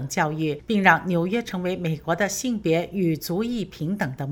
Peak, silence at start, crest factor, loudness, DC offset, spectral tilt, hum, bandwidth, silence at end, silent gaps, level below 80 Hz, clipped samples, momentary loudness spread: 0 dBFS; 0 s; 22 dB; -24 LUFS; under 0.1%; -5 dB/octave; none; over 20 kHz; 0 s; none; -52 dBFS; under 0.1%; 9 LU